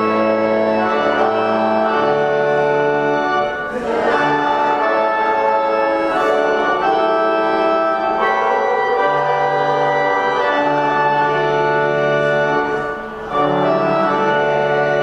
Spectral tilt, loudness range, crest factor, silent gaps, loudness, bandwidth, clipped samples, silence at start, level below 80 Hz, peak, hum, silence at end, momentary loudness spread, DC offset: -6 dB/octave; 1 LU; 12 dB; none; -16 LUFS; 9.4 kHz; under 0.1%; 0 s; -50 dBFS; -4 dBFS; none; 0 s; 2 LU; under 0.1%